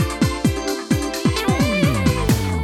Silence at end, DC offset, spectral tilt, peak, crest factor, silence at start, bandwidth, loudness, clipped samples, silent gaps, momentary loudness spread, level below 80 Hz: 0 s; under 0.1%; -5.5 dB/octave; -4 dBFS; 16 dB; 0 s; 17.5 kHz; -19 LUFS; under 0.1%; none; 4 LU; -30 dBFS